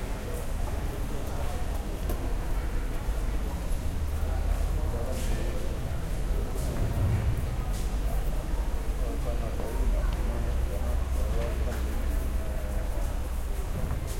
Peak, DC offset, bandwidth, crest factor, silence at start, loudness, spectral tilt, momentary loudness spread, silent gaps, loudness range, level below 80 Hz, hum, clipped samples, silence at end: -16 dBFS; under 0.1%; 16.5 kHz; 12 dB; 0 s; -32 LUFS; -6 dB/octave; 4 LU; none; 2 LU; -30 dBFS; none; under 0.1%; 0 s